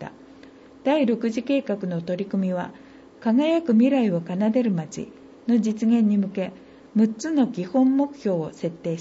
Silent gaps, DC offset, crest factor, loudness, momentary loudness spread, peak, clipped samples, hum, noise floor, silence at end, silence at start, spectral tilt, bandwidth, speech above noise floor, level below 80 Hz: none; under 0.1%; 14 dB; -23 LUFS; 11 LU; -10 dBFS; under 0.1%; none; -47 dBFS; 0 s; 0 s; -7 dB/octave; 8 kHz; 25 dB; -66 dBFS